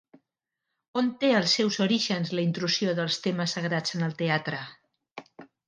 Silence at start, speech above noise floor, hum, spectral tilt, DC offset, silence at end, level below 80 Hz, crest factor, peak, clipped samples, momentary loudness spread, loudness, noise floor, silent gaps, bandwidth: 0.95 s; 59 dB; none; -4.5 dB/octave; under 0.1%; 0.2 s; -76 dBFS; 18 dB; -10 dBFS; under 0.1%; 17 LU; -26 LUFS; -86 dBFS; 5.11-5.15 s; 10 kHz